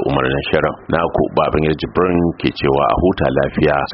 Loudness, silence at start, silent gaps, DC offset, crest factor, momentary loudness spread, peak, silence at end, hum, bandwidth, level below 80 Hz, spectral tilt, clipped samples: -16 LUFS; 0 s; none; under 0.1%; 16 dB; 3 LU; 0 dBFS; 0 s; none; 5.8 kHz; -34 dBFS; -5 dB/octave; under 0.1%